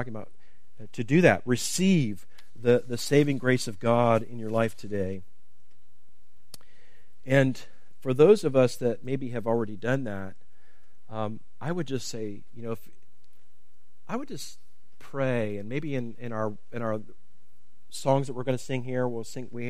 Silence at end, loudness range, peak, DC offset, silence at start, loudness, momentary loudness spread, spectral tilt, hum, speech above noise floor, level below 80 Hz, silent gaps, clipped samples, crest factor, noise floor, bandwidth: 0 s; 12 LU; -4 dBFS; 2%; 0 s; -27 LUFS; 17 LU; -6 dB/octave; none; 43 dB; -64 dBFS; none; under 0.1%; 24 dB; -69 dBFS; 15.5 kHz